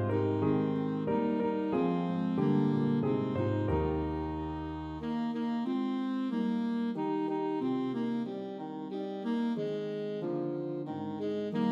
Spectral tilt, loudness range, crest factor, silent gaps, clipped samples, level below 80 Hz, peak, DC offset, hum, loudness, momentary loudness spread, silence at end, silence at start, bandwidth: -9.5 dB/octave; 5 LU; 14 dB; none; under 0.1%; -52 dBFS; -18 dBFS; under 0.1%; none; -33 LUFS; 8 LU; 0 s; 0 s; 7.2 kHz